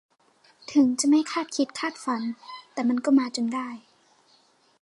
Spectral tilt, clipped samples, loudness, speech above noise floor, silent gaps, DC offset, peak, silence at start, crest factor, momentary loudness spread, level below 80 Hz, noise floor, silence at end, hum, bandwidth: -3 dB/octave; under 0.1%; -25 LUFS; 38 dB; none; under 0.1%; -10 dBFS; 0.7 s; 16 dB; 16 LU; -78 dBFS; -62 dBFS; 1 s; none; 11.5 kHz